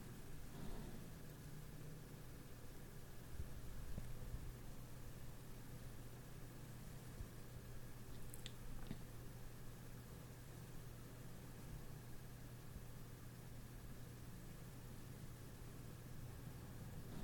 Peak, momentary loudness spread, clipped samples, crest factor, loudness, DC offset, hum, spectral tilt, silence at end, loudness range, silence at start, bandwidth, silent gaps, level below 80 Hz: -32 dBFS; 3 LU; under 0.1%; 20 dB; -56 LUFS; under 0.1%; none; -5.5 dB/octave; 0 s; 1 LU; 0 s; 17.5 kHz; none; -58 dBFS